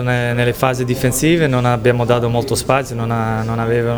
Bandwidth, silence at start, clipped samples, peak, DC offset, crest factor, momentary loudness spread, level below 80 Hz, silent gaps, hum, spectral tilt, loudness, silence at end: over 20 kHz; 0 s; under 0.1%; 0 dBFS; under 0.1%; 16 dB; 5 LU; -38 dBFS; none; none; -5.5 dB/octave; -16 LUFS; 0 s